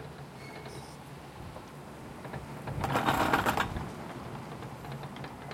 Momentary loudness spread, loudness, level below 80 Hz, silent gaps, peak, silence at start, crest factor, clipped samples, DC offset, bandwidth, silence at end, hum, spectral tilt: 18 LU; -34 LUFS; -52 dBFS; none; -12 dBFS; 0 s; 24 dB; under 0.1%; under 0.1%; 16.5 kHz; 0 s; none; -5 dB/octave